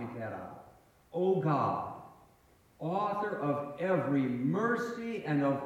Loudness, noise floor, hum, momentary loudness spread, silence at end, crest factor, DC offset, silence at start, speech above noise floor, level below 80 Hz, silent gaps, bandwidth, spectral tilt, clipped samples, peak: -33 LUFS; -64 dBFS; none; 13 LU; 0 s; 16 dB; under 0.1%; 0 s; 32 dB; -72 dBFS; none; 14 kHz; -8 dB/octave; under 0.1%; -16 dBFS